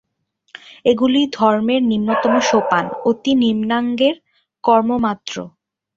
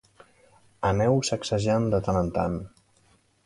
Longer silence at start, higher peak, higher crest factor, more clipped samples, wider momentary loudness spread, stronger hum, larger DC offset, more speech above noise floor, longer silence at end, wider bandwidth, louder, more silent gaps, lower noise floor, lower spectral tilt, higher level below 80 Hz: about the same, 0.7 s vs 0.8 s; first, -2 dBFS vs -10 dBFS; about the same, 16 dB vs 18 dB; neither; about the same, 8 LU vs 7 LU; neither; neither; first, 50 dB vs 39 dB; second, 0.5 s vs 0.8 s; second, 7.6 kHz vs 11.5 kHz; first, -17 LUFS vs -26 LUFS; neither; about the same, -66 dBFS vs -63 dBFS; about the same, -5 dB/octave vs -6 dB/octave; second, -56 dBFS vs -46 dBFS